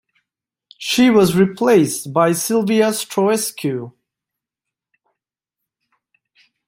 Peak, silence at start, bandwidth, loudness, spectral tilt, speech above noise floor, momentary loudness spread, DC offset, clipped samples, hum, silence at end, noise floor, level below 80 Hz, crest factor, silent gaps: -2 dBFS; 0.8 s; 16.5 kHz; -16 LUFS; -4.5 dB/octave; 69 dB; 11 LU; under 0.1%; under 0.1%; none; 2.8 s; -85 dBFS; -58 dBFS; 18 dB; none